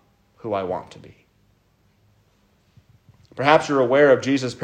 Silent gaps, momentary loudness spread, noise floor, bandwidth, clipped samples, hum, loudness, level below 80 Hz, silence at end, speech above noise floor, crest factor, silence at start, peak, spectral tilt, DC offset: none; 16 LU; -62 dBFS; 9.8 kHz; under 0.1%; none; -19 LUFS; -64 dBFS; 0 s; 42 dB; 22 dB; 0.45 s; -2 dBFS; -5.5 dB/octave; under 0.1%